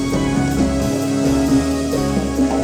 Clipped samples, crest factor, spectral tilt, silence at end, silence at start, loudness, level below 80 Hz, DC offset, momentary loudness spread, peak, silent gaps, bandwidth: under 0.1%; 12 dB; -6 dB/octave; 0 s; 0 s; -18 LUFS; -30 dBFS; under 0.1%; 3 LU; -6 dBFS; none; over 20 kHz